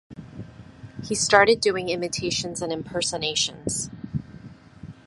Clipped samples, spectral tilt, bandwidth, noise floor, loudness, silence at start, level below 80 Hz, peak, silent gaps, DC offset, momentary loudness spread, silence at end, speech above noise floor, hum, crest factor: under 0.1%; -2.5 dB/octave; 11.5 kHz; -45 dBFS; -23 LUFS; 0.1 s; -52 dBFS; 0 dBFS; none; under 0.1%; 25 LU; 0.15 s; 21 dB; none; 26 dB